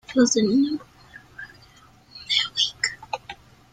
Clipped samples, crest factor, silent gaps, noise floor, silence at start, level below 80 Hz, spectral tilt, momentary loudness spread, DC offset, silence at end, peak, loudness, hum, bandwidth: under 0.1%; 20 dB; none; -53 dBFS; 0.1 s; -60 dBFS; -2.5 dB/octave; 23 LU; under 0.1%; 0.4 s; -6 dBFS; -23 LUFS; none; 9.6 kHz